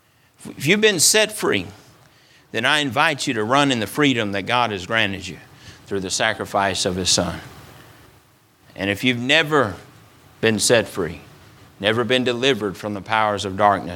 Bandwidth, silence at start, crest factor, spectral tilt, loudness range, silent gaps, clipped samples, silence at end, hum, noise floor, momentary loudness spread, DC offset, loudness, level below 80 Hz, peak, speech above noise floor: 18.5 kHz; 0.4 s; 20 dB; -3 dB/octave; 4 LU; none; under 0.1%; 0 s; none; -55 dBFS; 13 LU; under 0.1%; -19 LUFS; -54 dBFS; 0 dBFS; 35 dB